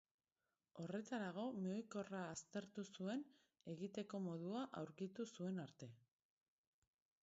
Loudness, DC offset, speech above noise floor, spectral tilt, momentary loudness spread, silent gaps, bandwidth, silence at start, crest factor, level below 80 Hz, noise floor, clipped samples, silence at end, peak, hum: -50 LUFS; under 0.1%; over 41 dB; -6 dB/octave; 10 LU; none; 7.6 kHz; 0.75 s; 16 dB; -88 dBFS; under -90 dBFS; under 0.1%; 1.25 s; -34 dBFS; none